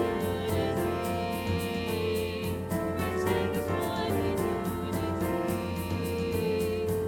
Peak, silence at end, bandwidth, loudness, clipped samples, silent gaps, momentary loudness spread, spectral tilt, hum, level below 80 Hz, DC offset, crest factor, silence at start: -14 dBFS; 0 s; 19 kHz; -30 LUFS; under 0.1%; none; 3 LU; -6 dB/octave; none; -48 dBFS; under 0.1%; 14 dB; 0 s